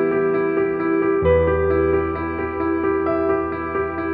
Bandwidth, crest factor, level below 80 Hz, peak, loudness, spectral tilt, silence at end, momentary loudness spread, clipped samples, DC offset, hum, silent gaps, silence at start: 4.7 kHz; 14 dB; -36 dBFS; -4 dBFS; -20 LUFS; -11.5 dB/octave; 0 s; 7 LU; under 0.1%; under 0.1%; none; none; 0 s